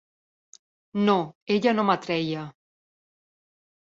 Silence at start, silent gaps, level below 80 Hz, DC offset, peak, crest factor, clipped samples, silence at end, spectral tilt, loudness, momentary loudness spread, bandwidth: 0.95 s; 1.35-1.47 s; -70 dBFS; under 0.1%; -6 dBFS; 22 dB; under 0.1%; 1.45 s; -6.5 dB/octave; -25 LUFS; 12 LU; 7.6 kHz